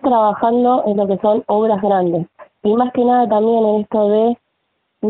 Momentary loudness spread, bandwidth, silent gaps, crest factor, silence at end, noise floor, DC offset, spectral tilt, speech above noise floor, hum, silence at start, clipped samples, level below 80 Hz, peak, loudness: 6 LU; 4.4 kHz; none; 12 dB; 0 s; -69 dBFS; under 0.1%; -6.5 dB/octave; 55 dB; none; 0.05 s; under 0.1%; -58 dBFS; -4 dBFS; -15 LUFS